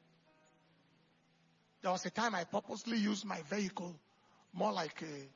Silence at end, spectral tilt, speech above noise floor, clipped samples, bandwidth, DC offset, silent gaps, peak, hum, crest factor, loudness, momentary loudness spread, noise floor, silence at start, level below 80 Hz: 0.05 s; -3.5 dB/octave; 34 dB; under 0.1%; 7.2 kHz; under 0.1%; none; -22 dBFS; none; 18 dB; -39 LUFS; 11 LU; -72 dBFS; 1.85 s; -84 dBFS